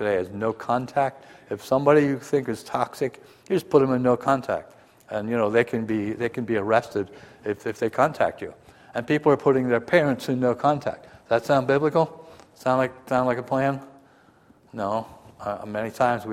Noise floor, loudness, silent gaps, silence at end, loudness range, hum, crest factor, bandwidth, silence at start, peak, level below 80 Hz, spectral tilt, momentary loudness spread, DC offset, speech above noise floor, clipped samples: -56 dBFS; -24 LUFS; none; 0 s; 4 LU; none; 20 dB; 15.5 kHz; 0 s; -4 dBFS; -62 dBFS; -7 dB/octave; 13 LU; under 0.1%; 32 dB; under 0.1%